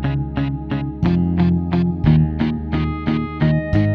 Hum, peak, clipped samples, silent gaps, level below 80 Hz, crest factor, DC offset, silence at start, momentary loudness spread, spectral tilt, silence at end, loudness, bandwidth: none; -2 dBFS; under 0.1%; none; -30 dBFS; 16 dB; under 0.1%; 0 s; 7 LU; -10 dB/octave; 0 s; -19 LUFS; 5.4 kHz